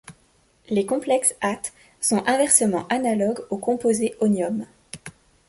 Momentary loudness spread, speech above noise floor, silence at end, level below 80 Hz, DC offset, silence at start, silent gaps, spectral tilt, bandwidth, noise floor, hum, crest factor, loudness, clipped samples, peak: 16 LU; 39 dB; 0.4 s; -62 dBFS; under 0.1%; 0.1 s; none; -3.5 dB/octave; 12 kHz; -61 dBFS; none; 22 dB; -22 LUFS; under 0.1%; -2 dBFS